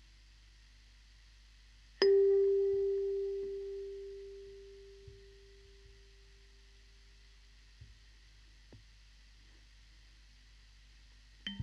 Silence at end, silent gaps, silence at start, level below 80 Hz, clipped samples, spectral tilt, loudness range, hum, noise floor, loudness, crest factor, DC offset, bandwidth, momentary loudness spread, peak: 0 s; none; 2 s; -60 dBFS; under 0.1%; -5.5 dB/octave; 22 LU; 50 Hz at -60 dBFS; -60 dBFS; -33 LUFS; 26 dB; under 0.1%; 6.8 kHz; 28 LU; -14 dBFS